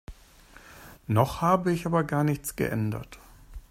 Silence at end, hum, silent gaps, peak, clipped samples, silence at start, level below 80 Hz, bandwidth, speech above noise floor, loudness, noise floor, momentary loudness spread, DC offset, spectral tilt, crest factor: 0.1 s; none; none; -6 dBFS; under 0.1%; 0.1 s; -50 dBFS; 16 kHz; 27 dB; -27 LUFS; -53 dBFS; 21 LU; under 0.1%; -6.5 dB/octave; 22 dB